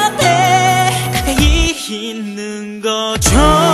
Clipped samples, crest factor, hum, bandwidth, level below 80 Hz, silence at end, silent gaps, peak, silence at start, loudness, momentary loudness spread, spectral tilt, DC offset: under 0.1%; 14 dB; none; 13.5 kHz; -22 dBFS; 0 s; none; 0 dBFS; 0 s; -13 LUFS; 13 LU; -4 dB/octave; under 0.1%